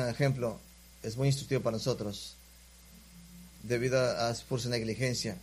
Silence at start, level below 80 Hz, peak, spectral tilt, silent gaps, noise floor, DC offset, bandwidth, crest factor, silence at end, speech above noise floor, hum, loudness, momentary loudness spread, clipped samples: 0 s; -56 dBFS; -14 dBFS; -5 dB/octave; none; -56 dBFS; under 0.1%; 15.5 kHz; 18 dB; 0 s; 24 dB; 60 Hz at -55 dBFS; -32 LUFS; 21 LU; under 0.1%